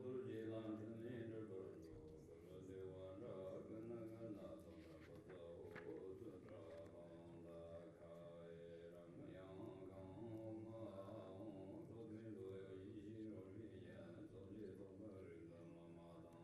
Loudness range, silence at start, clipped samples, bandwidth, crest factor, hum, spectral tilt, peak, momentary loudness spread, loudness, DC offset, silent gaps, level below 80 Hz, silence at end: 4 LU; 0 s; under 0.1%; 13 kHz; 16 dB; none; -8 dB/octave; -40 dBFS; 8 LU; -57 LUFS; under 0.1%; none; -80 dBFS; 0 s